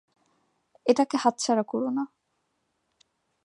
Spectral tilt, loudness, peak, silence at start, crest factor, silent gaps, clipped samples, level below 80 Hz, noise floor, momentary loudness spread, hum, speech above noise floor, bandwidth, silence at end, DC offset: -4 dB/octave; -26 LUFS; -6 dBFS; 0.85 s; 22 dB; none; under 0.1%; -82 dBFS; -76 dBFS; 9 LU; none; 51 dB; 11 kHz; 1.4 s; under 0.1%